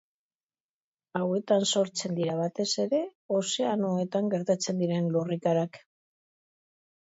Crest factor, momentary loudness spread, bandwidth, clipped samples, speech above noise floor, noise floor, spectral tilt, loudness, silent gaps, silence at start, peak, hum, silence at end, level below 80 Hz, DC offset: 18 dB; 5 LU; 8 kHz; under 0.1%; over 62 dB; under -90 dBFS; -5 dB/octave; -28 LUFS; 3.15-3.29 s; 1.15 s; -12 dBFS; none; 1.25 s; -76 dBFS; under 0.1%